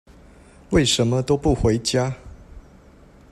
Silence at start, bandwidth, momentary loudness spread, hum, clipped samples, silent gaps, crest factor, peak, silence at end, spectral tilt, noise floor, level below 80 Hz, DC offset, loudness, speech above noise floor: 0.7 s; 14.5 kHz; 7 LU; none; under 0.1%; none; 18 dB; -4 dBFS; 0.7 s; -5 dB/octave; -48 dBFS; -36 dBFS; under 0.1%; -20 LUFS; 29 dB